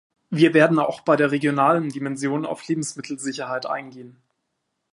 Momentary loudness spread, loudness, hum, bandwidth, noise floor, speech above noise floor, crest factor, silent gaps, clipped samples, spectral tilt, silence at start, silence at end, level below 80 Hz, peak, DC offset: 13 LU; -21 LUFS; none; 11.5 kHz; -77 dBFS; 55 dB; 20 dB; none; under 0.1%; -5.5 dB/octave; 0.3 s; 0.85 s; -74 dBFS; -2 dBFS; under 0.1%